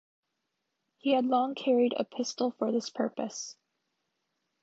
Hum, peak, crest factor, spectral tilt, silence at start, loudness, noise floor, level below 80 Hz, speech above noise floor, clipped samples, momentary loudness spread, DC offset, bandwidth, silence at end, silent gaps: none; -14 dBFS; 18 dB; -4 dB/octave; 1.05 s; -30 LUFS; -83 dBFS; -82 dBFS; 53 dB; under 0.1%; 10 LU; under 0.1%; 8 kHz; 1.1 s; none